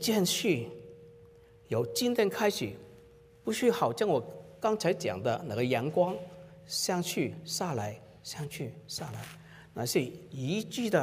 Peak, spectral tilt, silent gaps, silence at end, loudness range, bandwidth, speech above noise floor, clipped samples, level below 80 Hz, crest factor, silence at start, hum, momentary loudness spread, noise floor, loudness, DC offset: -14 dBFS; -4.5 dB/octave; none; 0 s; 5 LU; 16 kHz; 26 dB; under 0.1%; -68 dBFS; 18 dB; 0 s; none; 16 LU; -56 dBFS; -32 LUFS; under 0.1%